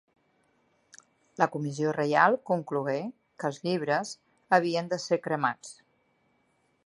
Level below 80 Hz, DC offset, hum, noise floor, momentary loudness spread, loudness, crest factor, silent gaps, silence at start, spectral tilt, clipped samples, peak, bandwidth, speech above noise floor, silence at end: -80 dBFS; under 0.1%; none; -71 dBFS; 17 LU; -28 LUFS; 24 dB; none; 1.4 s; -5.5 dB/octave; under 0.1%; -6 dBFS; 11.5 kHz; 43 dB; 1.15 s